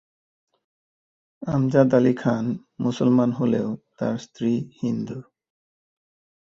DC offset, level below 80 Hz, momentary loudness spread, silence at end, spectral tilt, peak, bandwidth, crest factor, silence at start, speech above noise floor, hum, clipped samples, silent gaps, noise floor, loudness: under 0.1%; -60 dBFS; 12 LU; 1.25 s; -8 dB/octave; -4 dBFS; 7.4 kHz; 22 dB; 1.4 s; over 68 dB; none; under 0.1%; none; under -90 dBFS; -23 LUFS